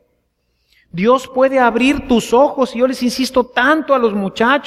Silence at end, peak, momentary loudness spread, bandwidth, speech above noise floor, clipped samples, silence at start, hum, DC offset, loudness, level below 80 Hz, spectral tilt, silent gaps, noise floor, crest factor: 0 s; 0 dBFS; 4 LU; 15 kHz; 51 dB; under 0.1%; 0.95 s; none; under 0.1%; -14 LUFS; -44 dBFS; -4.5 dB/octave; none; -65 dBFS; 14 dB